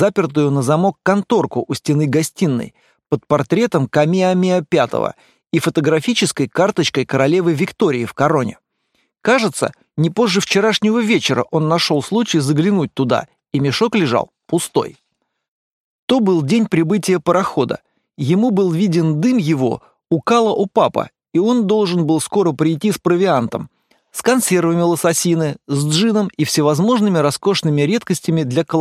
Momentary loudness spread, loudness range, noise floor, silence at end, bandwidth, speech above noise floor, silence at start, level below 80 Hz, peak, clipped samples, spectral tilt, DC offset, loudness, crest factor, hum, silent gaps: 7 LU; 2 LU; -65 dBFS; 0 s; 15 kHz; 50 dB; 0 s; -58 dBFS; 0 dBFS; under 0.1%; -5.5 dB/octave; under 0.1%; -16 LUFS; 16 dB; none; 15.48-16.08 s